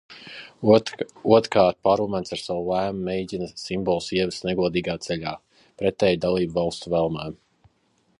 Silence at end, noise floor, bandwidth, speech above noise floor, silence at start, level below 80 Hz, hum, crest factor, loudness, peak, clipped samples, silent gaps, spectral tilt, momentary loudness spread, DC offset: 0.85 s; -66 dBFS; 11 kHz; 43 dB; 0.1 s; -52 dBFS; none; 22 dB; -23 LUFS; -2 dBFS; under 0.1%; none; -6 dB/octave; 13 LU; under 0.1%